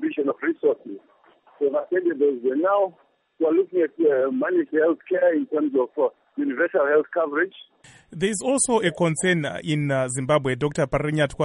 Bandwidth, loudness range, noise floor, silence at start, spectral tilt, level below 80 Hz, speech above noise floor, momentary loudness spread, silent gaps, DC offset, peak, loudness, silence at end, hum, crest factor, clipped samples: 11.5 kHz; 2 LU; -43 dBFS; 0 s; -5 dB/octave; -54 dBFS; 21 dB; 5 LU; none; under 0.1%; -8 dBFS; -23 LUFS; 0 s; none; 16 dB; under 0.1%